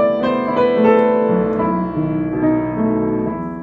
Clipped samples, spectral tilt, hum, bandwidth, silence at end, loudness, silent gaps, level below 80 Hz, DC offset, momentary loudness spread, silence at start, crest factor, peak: under 0.1%; -9.5 dB/octave; none; 5.2 kHz; 0 s; -17 LUFS; none; -44 dBFS; under 0.1%; 7 LU; 0 s; 16 dB; 0 dBFS